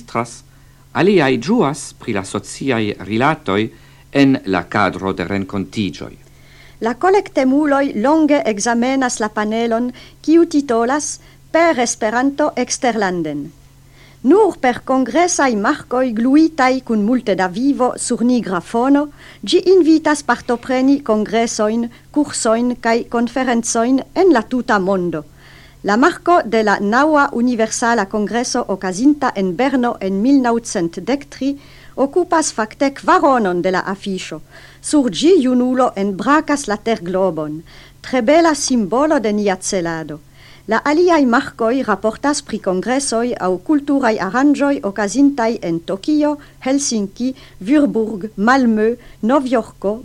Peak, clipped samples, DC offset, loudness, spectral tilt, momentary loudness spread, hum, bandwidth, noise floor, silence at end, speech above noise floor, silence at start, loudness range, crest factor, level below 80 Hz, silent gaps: 0 dBFS; under 0.1%; under 0.1%; -16 LUFS; -4.5 dB/octave; 10 LU; none; 12.5 kHz; -44 dBFS; 0 s; 28 dB; 0 s; 3 LU; 16 dB; -48 dBFS; none